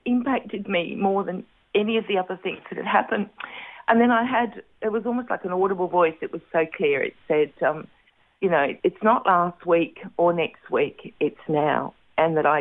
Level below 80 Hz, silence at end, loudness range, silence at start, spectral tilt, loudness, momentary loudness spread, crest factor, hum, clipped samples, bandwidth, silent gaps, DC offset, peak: -66 dBFS; 0 s; 2 LU; 0.05 s; -9 dB/octave; -24 LUFS; 10 LU; 18 dB; none; under 0.1%; 4 kHz; none; under 0.1%; -4 dBFS